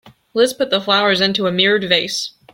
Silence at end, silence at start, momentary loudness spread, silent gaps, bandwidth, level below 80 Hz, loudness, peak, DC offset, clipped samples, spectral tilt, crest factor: 0.25 s; 0.05 s; 8 LU; none; 16.5 kHz; -60 dBFS; -16 LUFS; 0 dBFS; under 0.1%; under 0.1%; -3.5 dB/octave; 18 dB